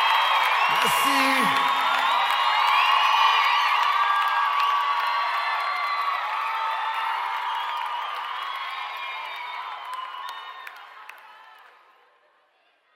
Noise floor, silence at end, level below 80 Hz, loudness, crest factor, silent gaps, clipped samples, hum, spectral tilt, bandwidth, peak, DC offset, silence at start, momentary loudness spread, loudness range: -64 dBFS; 1.4 s; -76 dBFS; -22 LUFS; 18 dB; none; under 0.1%; none; -1 dB/octave; 16.5 kHz; -6 dBFS; under 0.1%; 0 s; 15 LU; 16 LU